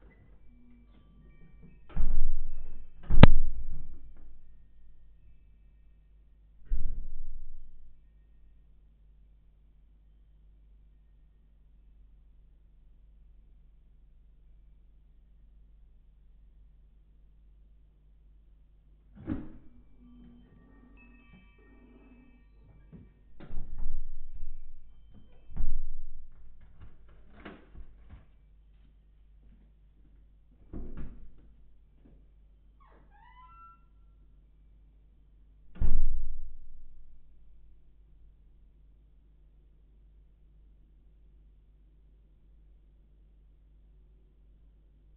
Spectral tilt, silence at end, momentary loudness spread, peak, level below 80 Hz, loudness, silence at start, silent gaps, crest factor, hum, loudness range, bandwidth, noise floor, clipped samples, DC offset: -6.5 dB/octave; 8.3 s; 25 LU; -2 dBFS; -32 dBFS; -33 LUFS; 1.95 s; none; 26 dB; none; 28 LU; 4 kHz; -59 dBFS; under 0.1%; under 0.1%